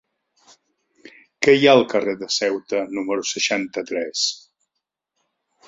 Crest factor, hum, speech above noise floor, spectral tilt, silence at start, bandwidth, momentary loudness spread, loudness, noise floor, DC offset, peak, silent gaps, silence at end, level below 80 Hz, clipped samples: 22 dB; none; 61 dB; -3 dB/octave; 1.05 s; 7.8 kHz; 11 LU; -20 LUFS; -80 dBFS; under 0.1%; 0 dBFS; none; 1.3 s; -68 dBFS; under 0.1%